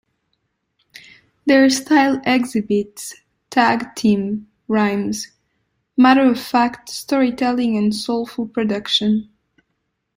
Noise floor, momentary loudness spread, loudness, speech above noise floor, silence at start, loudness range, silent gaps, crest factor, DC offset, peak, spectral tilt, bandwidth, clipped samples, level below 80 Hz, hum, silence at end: -73 dBFS; 12 LU; -18 LUFS; 56 dB; 1.45 s; 3 LU; none; 16 dB; under 0.1%; -2 dBFS; -4.5 dB/octave; 16 kHz; under 0.1%; -58 dBFS; none; 0.95 s